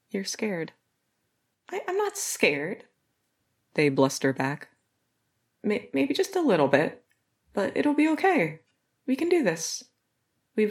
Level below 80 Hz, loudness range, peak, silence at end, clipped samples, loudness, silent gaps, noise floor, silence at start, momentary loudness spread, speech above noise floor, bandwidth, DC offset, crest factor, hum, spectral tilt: -78 dBFS; 5 LU; -4 dBFS; 0 s; under 0.1%; -26 LUFS; none; -76 dBFS; 0.15 s; 13 LU; 51 dB; 17 kHz; under 0.1%; 24 dB; none; -4.5 dB/octave